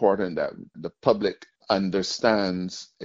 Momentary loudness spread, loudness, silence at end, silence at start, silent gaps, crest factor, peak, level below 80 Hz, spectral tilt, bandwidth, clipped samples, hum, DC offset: 13 LU; -25 LUFS; 0 s; 0 s; none; 22 dB; -4 dBFS; -60 dBFS; -4 dB/octave; 7.8 kHz; under 0.1%; none; under 0.1%